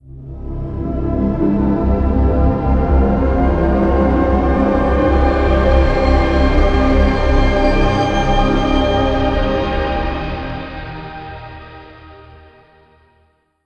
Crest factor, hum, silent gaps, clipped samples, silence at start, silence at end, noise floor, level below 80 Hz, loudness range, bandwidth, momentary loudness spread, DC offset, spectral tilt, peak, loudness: 14 dB; none; none; under 0.1%; 0.05 s; 1.5 s; -58 dBFS; -18 dBFS; 10 LU; 6.8 kHz; 15 LU; under 0.1%; -8 dB/octave; 0 dBFS; -15 LUFS